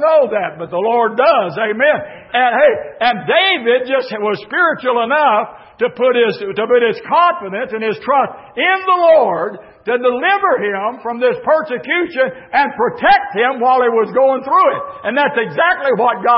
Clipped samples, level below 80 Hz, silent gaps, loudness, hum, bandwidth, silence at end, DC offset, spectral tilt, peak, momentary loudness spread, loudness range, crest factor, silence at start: under 0.1%; -58 dBFS; none; -14 LUFS; none; 5.8 kHz; 0 s; under 0.1%; -9.5 dB/octave; 0 dBFS; 8 LU; 2 LU; 14 dB; 0 s